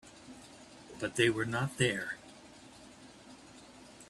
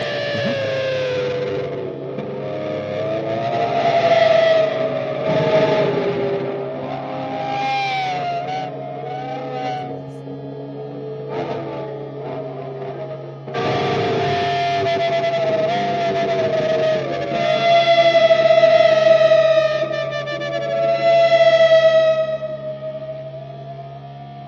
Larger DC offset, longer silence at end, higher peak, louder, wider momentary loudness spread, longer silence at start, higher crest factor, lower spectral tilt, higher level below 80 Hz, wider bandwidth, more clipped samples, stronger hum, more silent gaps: neither; about the same, 0.05 s vs 0 s; second, -14 dBFS vs -2 dBFS; second, -33 LUFS vs -18 LUFS; first, 24 LU vs 17 LU; about the same, 0.05 s vs 0 s; first, 24 dB vs 16 dB; about the same, -4.5 dB/octave vs -5.5 dB/octave; second, -66 dBFS vs -58 dBFS; first, 13.5 kHz vs 7.2 kHz; neither; neither; neither